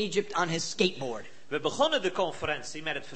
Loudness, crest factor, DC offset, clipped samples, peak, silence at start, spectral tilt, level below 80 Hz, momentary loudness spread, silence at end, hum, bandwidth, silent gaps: -30 LUFS; 22 dB; 0.8%; under 0.1%; -8 dBFS; 0 s; -3.5 dB/octave; -64 dBFS; 10 LU; 0 s; none; 8.8 kHz; none